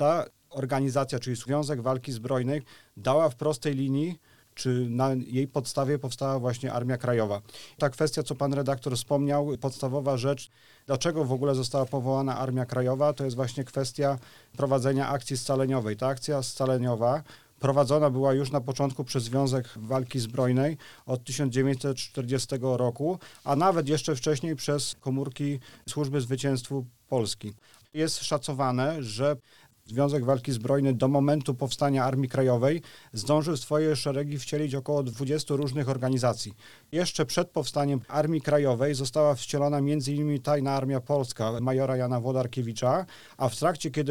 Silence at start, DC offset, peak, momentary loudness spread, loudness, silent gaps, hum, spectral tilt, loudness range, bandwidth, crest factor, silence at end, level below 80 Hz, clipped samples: 0 s; 0.2%; -10 dBFS; 7 LU; -28 LUFS; none; none; -6 dB/octave; 3 LU; 18 kHz; 18 dB; 0 s; -64 dBFS; under 0.1%